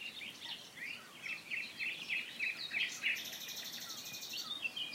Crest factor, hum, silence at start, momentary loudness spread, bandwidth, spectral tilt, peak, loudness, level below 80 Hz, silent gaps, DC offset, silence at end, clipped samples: 20 dB; none; 0 s; 9 LU; 16 kHz; 0.5 dB/octave; -22 dBFS; -40 LUFS; -86 dBFS; none; under 0.1%; 0 s; under 0.1%